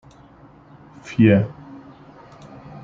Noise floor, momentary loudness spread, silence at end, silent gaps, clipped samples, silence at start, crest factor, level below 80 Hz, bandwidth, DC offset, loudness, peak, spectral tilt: -47 dBFS; 27 LU; 0.05 s; none; under 0.1%; 1.05 s; 20 dB; -56 dBFS; 7.4 kHz; under 0.1%; -18 LUFS; -2 dBFS; -8.5 dB/octave